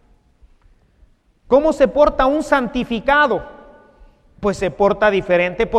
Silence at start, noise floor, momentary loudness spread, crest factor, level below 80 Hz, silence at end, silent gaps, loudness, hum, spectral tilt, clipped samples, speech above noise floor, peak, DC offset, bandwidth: 1.5 s; -54 dBFS; 7 LU; 18 dB; -38 dBFS; 0 s; none; -16 LUFS; none; -5.5 dB/octave; under 0.1%; 38 dB; 0 dBFS; under 0.1%; 11 kHz